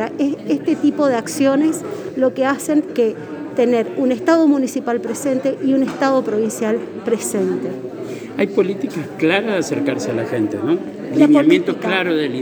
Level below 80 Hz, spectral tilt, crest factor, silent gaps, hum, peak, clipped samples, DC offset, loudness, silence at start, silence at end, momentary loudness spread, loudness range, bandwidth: -66 dBFS; -5 dB/octave; 16 dB; none; none; 0 dBFS; under 0.1%; under 0.1%; -18 LUFS; 0 s; 0 s; 8 LU; 3 LU; over 20 kHz